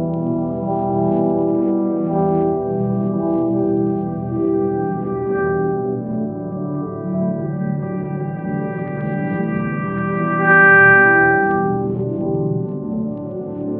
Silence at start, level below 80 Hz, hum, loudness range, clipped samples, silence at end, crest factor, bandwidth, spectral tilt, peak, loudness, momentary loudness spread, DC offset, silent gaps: 0 s; -52 dBFS; none; 9 LU; under 0.1%; 0 s; 16 dB; 3.3 kHz; -8 dB/octave; -2 dBFS; -18 LUFS; 13 LU; under 0.1%; none